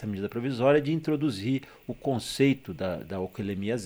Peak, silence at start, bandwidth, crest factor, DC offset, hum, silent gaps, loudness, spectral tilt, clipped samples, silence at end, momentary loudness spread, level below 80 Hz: -10 dBFS; 0 s; over 20 kHz; 18 dB; under 0.1%; none; none; -28 LUFS; -6.5 dB/octave; under 0.1%; 0 s; 10 LU; -58 dBFS